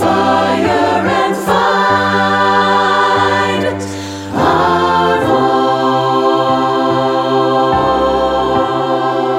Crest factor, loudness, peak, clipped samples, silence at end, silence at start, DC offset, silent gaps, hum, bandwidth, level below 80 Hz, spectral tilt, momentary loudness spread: 12 dB; -12 LUFS; 0 dBFS; under 0.1%; 0 s; 0 s; under 0.1%; none; none; 16 kHz; -40 dBFS; -5 dB/octave; 4 LU